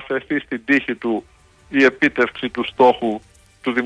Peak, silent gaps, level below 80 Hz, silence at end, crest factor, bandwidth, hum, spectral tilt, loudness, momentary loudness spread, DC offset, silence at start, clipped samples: -4 dBFS; none; -54 dBFS; 0 s; 16 dB; 10.5 kHz; none; -5.5 dB/octave; -19 LUFS; 10 LU; under 0.1%; 0 s; under 0.1%